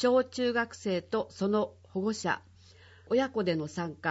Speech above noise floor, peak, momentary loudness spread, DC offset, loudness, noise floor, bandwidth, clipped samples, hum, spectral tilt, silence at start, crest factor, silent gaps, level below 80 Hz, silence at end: 26 dB; -14 dBFS; 6 LU; under 0.1%; -31 LUFS; -56 dBFS; 8 kHz; under 0.1%; none; -5.5 dB/octave; 0 s; 16 dB; none; -68 dBFS; 0 s